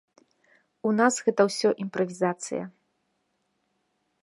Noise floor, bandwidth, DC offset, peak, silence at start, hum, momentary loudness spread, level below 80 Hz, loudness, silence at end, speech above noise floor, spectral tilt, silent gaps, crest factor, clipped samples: -75 dBFS; 11.5 kHz; under 0.1%; -6 dBFS; 0.85 s; none; 11 LU; -78 dBFS; -26 LUFS; 1.55 s; 50 dB; -4.5 dB/octave; none; 22 dB; under 0.1%